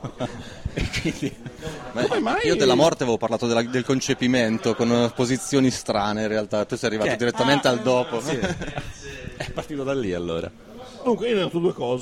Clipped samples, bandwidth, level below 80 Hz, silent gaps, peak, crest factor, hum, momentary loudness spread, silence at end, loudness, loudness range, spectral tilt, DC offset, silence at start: under 0.1%; 15.5 kHz; -44 dBFS; none; -6 dBFS; 18 dB; none; 14 LU; 0 s; -23 LUFS; 6 LU; -5 dB/octave; under 0.1%; 0 s